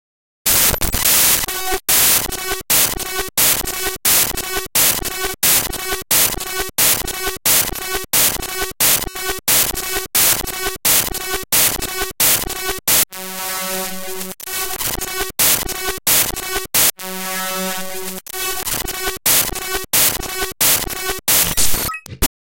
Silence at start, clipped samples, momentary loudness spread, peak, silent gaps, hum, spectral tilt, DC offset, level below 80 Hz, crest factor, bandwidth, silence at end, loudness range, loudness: 0.45 s; under 0.1%; 10 LU; 0 dBFS; none; none; -0.5 dB/octave; under 0.1%; -36 dBFS; 18 dB; 18 kHz; 0.25 s; 4 LU; -15 LUFS